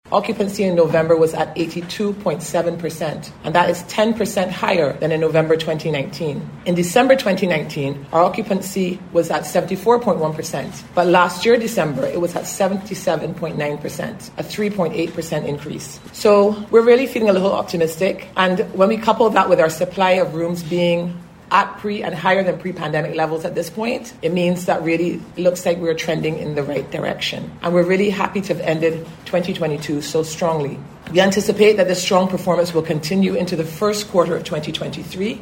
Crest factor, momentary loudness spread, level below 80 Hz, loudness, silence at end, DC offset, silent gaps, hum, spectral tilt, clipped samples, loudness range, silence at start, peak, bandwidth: 18 dB; 10 LU; -52 dBFS; -19 LUFS; 0 s; under 0.1%; none; none; -5 dB/octave; under 0.1%; 4 LU; 0.05 s; 0 dBFS; 16.5 kHz